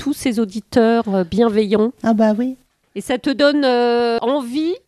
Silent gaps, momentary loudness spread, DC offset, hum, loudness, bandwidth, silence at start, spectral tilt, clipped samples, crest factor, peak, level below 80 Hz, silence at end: none; 8 LU; under 0.1%; none; -17 LUFS; 13.5 kHz; 0 s; -5.5 dB/octave; under 0.1%; 16 dB; 0 dBFS; -52 dBFS; 0.1 s